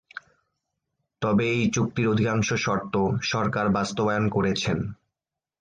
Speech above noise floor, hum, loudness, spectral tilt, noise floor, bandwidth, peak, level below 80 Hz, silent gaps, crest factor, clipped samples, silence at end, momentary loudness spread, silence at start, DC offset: 65 dB; none; -25 LUFS; -5.5 dB/octave; -89 dBFS; 9.4 kHz; -12 dBFS; -52 dBFS; none; 14 dB; under 0.1%; 0.65 s; 7 LU; 0.15 s; under 0.1%